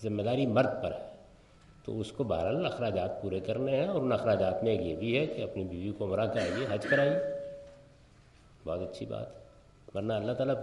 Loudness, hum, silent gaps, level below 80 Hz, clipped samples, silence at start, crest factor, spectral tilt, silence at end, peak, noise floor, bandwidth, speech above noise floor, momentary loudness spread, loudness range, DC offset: -32 LUFS; none; none; -62 dBFS; under 0.1%; 0 s; 18 dB; -7 dB/octave; 0 s; -14 dBFS; -59 dBFS; 11.5 kHz; 28 dB; 13 LU; 4 LU; under 0.1%